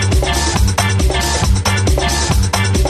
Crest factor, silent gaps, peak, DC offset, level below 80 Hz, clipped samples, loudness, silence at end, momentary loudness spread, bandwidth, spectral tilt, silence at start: 14 dB; none; 0 dBFS; under 0.1%; -18 dBFS; under 0.1%; -14 LUFS; 0 s; 1 LU; 14.5 kHz; -4 dB/octave; 0 s